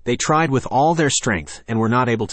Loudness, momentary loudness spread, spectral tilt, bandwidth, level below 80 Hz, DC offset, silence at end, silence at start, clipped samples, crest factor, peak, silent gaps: -18 LUFS; 6 LU; -4.5 dB/octave; 8.8 kHz; -46 dBFS; under 0.1%; 0 s; 0.05 s; under 0.1%; 14 dB; -4 dBFS; none